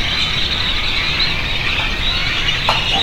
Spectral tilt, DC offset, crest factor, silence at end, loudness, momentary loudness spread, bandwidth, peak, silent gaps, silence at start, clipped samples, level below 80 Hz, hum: -3 dB/octave; under 0.1%; 16 dB; 0 s; -16 LUFS; 2 LU; 16.5 kHz; 0 dBFS; none; 0 s; under 0.1%; -26 dBFS; none